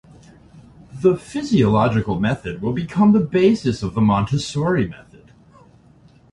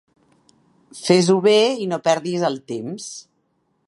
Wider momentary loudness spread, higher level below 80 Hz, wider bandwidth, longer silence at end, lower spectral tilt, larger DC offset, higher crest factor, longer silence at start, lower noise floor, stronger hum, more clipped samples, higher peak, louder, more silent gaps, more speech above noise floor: second, 9 LU vs 17 LU; first, -44 dBFS vs -70 dBFS; about the same, 11 kHz vs 11.5 kHz; first, 1.35 s vs 0.65 s; first, -7 dB/octave vs -5 dB/octave; neither; about the same, 16 dB vs 20 dB; second, 0.55 s vs 0.95 s; second, -50 dBFS vs -68 dBFS; neither; neither; about the same, -4 dBFS vs -2 dBFS; about the same, -19 LUFS vs -19 LUFS; neither; second, 32 dB vs 49 dB